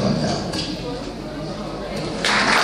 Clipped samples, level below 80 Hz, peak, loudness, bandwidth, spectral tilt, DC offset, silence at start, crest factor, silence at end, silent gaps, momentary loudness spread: under 0.1%; -40 dBFS; -2 dBFS; -23 LUFS; 15.5 kHz; -4 dB/octave; under 0.1%; 0 s; 22 dB; 0 s; none; 12 LU